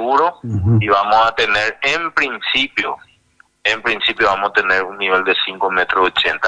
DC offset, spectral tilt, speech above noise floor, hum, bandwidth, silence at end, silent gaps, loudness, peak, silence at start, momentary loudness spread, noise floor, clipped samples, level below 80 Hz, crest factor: under 0.1%; -5 dB/octave; 38 dB; none; 9.8 kHz; 0 s; none; -16 LUFS; -2 dBFS; 0 s; 5 LU; -54 dBFS; under 0.1%; -46 dBFS; 16 dB